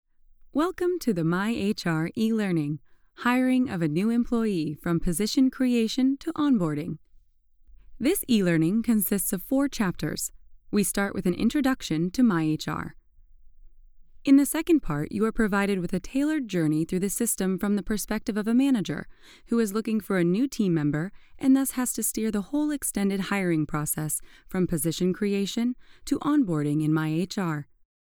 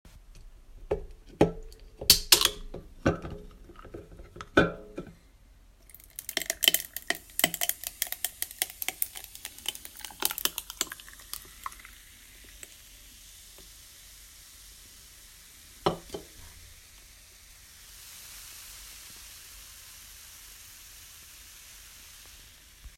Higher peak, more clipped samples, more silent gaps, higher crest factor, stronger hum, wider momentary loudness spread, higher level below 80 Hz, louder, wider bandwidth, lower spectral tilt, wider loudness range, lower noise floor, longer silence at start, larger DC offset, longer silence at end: second, -10 dBFS vs 0 dBFS; neither; neither; second, 16 dB vs 34 dB; neither; second, 7 LU vs 24 LU; about the same, -48 dBFS vs -52 dBFS; about the same, -26 LUFS vs -28 LUFS; first, over 20 kHz vs 16.5 kHz; first, -5.5 dB/octave vs -2 dB/octave; second, 2 LU vs 20 LU; about the same, -59 dBFS vs -56 dBFS; first, 0.45 s vs 0.05 s; neither; first, 0.4 s vs 0.1 s